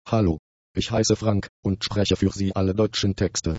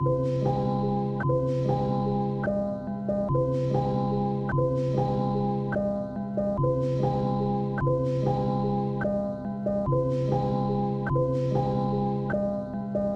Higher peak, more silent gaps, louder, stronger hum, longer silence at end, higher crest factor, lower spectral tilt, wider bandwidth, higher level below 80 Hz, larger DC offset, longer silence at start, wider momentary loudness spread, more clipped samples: first, -6 dBFS vs -14 dBFS; first, 0.39-0.75 s, 1.49-1.63 s vs none; first, -24 LUFS vs -27 LUFS; neither; about the same, 0 s vs 0 s; about the same, 16 dB vs 12 dB; second, -5.5 dB/octave vs -9.5 dB/octave; first, 8 kHz vs 6.4 kHz; about the same, -42 dBFS vs -46 dBFS; neither; about the same, 0.05 s vs 0 s; first, 7 LU vs 4 LU; neither